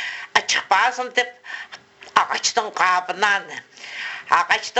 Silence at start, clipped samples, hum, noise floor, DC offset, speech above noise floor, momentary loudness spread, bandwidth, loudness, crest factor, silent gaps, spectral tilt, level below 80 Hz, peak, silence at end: 0 s; under 0.1%; none; -43 dBFS; under 0.1%; 22 dB; 16 LU; 8.4 kHz; -20 LUFS; 22 dB; none; 0.5 dB/octave; -68 dBFS; 0 dBFS; 0 s